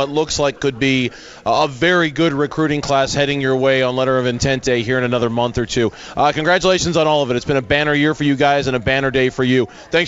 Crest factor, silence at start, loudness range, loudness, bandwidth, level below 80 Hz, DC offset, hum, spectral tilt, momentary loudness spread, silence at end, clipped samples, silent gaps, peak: 14 dB; 0 s; 1 LU; -17 LUFS; 8 kHz; -40 dBFS; under 0.1%; none; -5 dB/octave; 4 LU; 0 s; under 0.1%; none; -2 dBFS